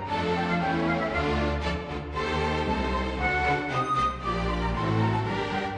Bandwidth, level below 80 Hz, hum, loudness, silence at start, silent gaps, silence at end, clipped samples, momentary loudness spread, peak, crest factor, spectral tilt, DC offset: 10 kHz; -38 dBFS; none; -27 LUFS; 0 s; none; 0 s; under 0.1%; 4 LU; -12 dBFS; 14 dB; -6.5 dB/octave; under 0.1%